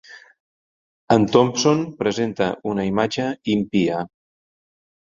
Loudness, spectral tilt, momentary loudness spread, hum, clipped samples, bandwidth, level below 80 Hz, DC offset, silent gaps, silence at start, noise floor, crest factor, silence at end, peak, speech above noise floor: -20 LUFS; -5.5 dB/octave; 8 LU; none; under 0.1%; 7.8 kHz; -56 dBFS; under 0.1%; 0.40-1.08 s; 0.1 s; under -90 dBFS; 20 dB; 1 s; -2 dBFS; over 70 dB